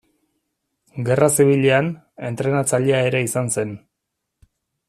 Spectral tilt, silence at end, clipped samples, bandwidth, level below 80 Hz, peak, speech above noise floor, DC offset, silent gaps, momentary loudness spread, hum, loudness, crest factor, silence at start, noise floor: -5 dB/octave; 1.1 s; under 0.1%; 14.5 kHz; -58 dBFS; -2 dBFS; 60 dB; under 0.1%; none; 15 LU; none; -19 LUFS; 18 dB; 0.95 s; -79 dBFS